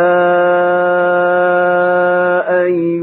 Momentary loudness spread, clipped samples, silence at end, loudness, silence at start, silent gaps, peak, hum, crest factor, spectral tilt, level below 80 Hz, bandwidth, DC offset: 2 LU; under 0.1%; 0 s; -12 LUFS; 0 s; none; -2 dBFS; none; 10 dB; -10.5 dB/octave; -66 dBFS; 4 kHz; under 0.1%